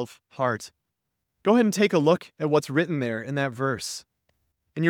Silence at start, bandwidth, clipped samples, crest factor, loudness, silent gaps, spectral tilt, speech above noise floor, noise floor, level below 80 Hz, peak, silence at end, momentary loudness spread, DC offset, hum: 0 s; 18 kHz; under 0.1%; 20 dB; -25 LUFS; none; -5.5 dB/octave; 57 dB; -81 dBFS; -70 dBFS; -6 dBFS; 0 s; 14 LU; under 0.1%; none